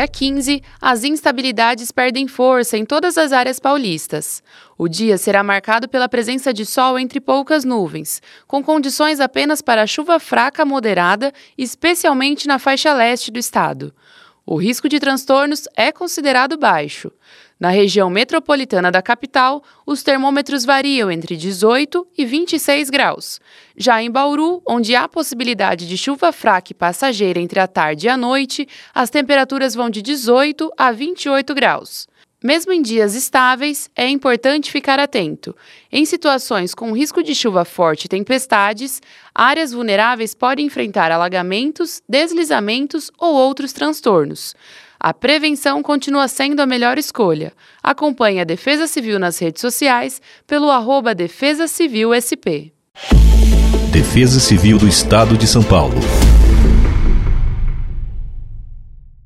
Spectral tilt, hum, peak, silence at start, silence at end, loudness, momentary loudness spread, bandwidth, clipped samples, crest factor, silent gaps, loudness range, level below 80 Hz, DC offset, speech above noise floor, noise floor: -4.5 dB/octave; none; 0 dBFS; 0 s; 0.15 s; -15 LUFS; 10 LU; 15.5 kHz; under 0.1%; 16 dB; none; 4 LU; -22 dBFS; under 0.1%; 20 dB; -35 dBFS